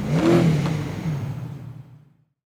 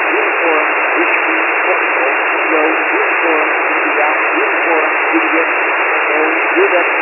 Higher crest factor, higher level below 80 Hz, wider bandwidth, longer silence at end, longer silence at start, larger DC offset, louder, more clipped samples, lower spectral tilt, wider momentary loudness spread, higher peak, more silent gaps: about the same, 18 dB vs 14 dB; first, -46 dBFS vs under -90 dBFS; first, 13 kHz vs 3 kHz; first, 0.55 s vs 0 s; about the same, 0 s vs 0 s; neither; second, -22 LUFS vs -12 LUFS; neither; first, -7.5 dB/octave vs -3.5 dB/octave; first, 21 LU vs 1 LU; second, -6 dBFS vs 0 dBFS; neither